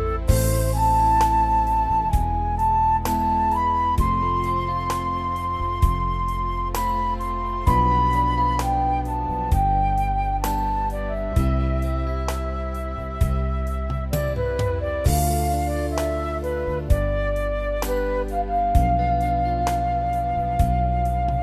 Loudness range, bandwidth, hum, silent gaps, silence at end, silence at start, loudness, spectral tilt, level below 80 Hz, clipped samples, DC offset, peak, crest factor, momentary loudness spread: 5 LU; 14 kHz; none; none; 0 s; 0 s; -23 LUFS; -6.5 dB/octave; -26 dBFS; under 0.1%; under 0.1%; -4 dBFS; 16 dB; 6 LU